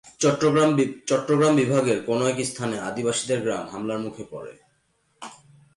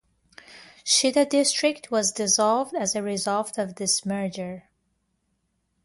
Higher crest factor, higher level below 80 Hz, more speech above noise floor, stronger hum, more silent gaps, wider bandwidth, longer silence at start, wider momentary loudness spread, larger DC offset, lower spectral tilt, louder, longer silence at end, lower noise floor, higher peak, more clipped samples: about the same, 14 dB vs 18 dB; about the same, -64 dBFS vs -68 dBFS; second, 45 dB vs 49 dB; neither; neither; about the same, 11.5 kHz vs 11.5 kHz; second, 0.05 s vs 0.5 s; first, 20 LU vs 11 LU; neither; first, -5 dB/octave vs -2.5 dB/octave; about the same, -23 LUFS vs -23 LUFS; second, 0.4 s vs 1.25 s; second, -67 dBFS vs -73 dBFS; about the same, -10 dBFS vs -8 dBFS; neither